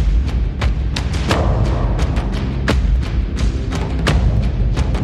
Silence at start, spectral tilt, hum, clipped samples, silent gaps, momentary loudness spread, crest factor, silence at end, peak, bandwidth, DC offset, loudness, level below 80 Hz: 0 s; -6.5 dB/octave; none; under 0.1%; none; 4 LU; 14 dB; 0 s; -2 dBFS; 10.5 kHz; under 0.1%; -19 LUFS; -18 dBFS